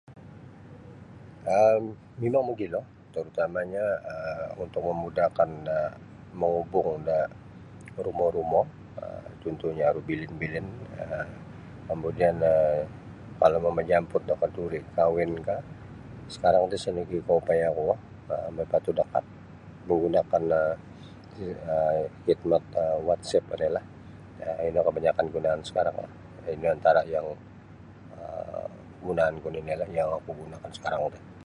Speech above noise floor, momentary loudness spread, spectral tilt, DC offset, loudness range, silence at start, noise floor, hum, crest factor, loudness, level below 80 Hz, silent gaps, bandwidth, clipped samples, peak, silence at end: 21 dB; 21 LU; -7 dB/octave; under 0.1%; 4 LU; 0.1 s; -48 dBFS; none; 22 dB; -28 LUFS; -54 dBFS; none; 11 kHz; under 0.1%; -8 dBFS; 0 s